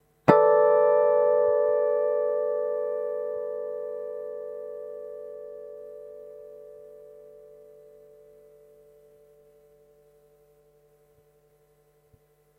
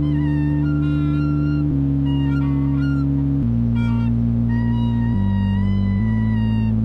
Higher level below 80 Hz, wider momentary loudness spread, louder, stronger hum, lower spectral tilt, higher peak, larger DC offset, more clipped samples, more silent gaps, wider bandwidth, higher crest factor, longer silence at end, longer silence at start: second, -70 dBFS vs -28 dBFS; first, 25 LU vs 0 LU; second, -24 LUFS vs -19 LUFS; neither; second, -8.5 dB/octave vs -10.5 dB/octave; first, 0 dBFS vs -10 dBFS; neither; neither; neither; about the same, 5.2 kHz vs 5 kHz; first, 28 dB vs 8 dB; first, 5.3 s vs 0 s; first, 0.25 s vs 0 s